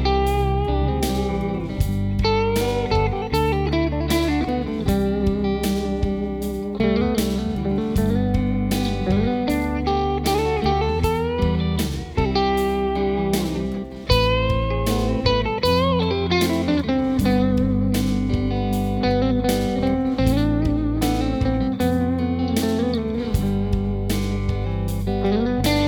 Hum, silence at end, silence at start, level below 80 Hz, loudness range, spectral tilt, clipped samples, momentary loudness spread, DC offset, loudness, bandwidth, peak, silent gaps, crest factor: none; 0 s; 0 s; -28 dBFS; 2 LU; -6.5 dB/octave; under 0.1%; 4 LU; under 0.1%; -21 LUFS; over 20 kHz; -2 dBFS; none; 18 dB